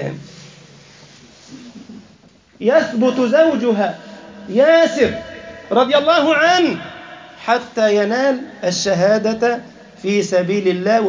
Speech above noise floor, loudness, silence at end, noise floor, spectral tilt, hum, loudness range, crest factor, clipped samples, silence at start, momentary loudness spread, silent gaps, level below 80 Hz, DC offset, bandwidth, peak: 34 dB; -16 LUFS; 0 s; -48 dBFS; -4.5 dB/octave; none; 3 LU; 16 dB; under 0.1%; 0 s; 21 LU; none; -56 dBFS; under 0.1%; 7.6 kHz; -2 dBFS